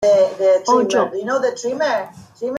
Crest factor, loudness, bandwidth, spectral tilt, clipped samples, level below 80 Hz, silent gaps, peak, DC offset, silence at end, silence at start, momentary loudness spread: 14 dB; -17 LUFS; 10.5 kHz; -4 dB/octave; under 0.1%; -62 dBFS; none; -4 dBFS; under 0.1%; 0 s; 0 s; 9 LU